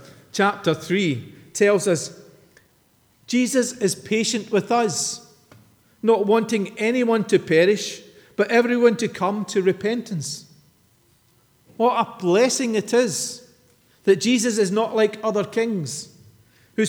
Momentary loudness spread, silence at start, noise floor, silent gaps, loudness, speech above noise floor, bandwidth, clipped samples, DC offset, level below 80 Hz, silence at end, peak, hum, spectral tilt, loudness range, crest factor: 13 LU; 0 s; -60 dBFS; none; -21 LUFS; 40 dB; 20 kHz; under 0.1%; under 0.1%; -70 dBFS; 0 s; -4 dBFS; none; -4 dB/octave; 3 LU; 18 dB